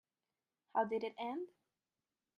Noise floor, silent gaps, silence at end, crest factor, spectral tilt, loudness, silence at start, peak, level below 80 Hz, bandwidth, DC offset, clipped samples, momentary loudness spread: under -90 dBFS; none; 0.9 s; 20 dB; -6.5 dB/octave; -41 LUFS; 0.75 s; -22 dBFS; -88 dBFS; 6.6 kHz; under 0.1%; under 0.1%; 10 LU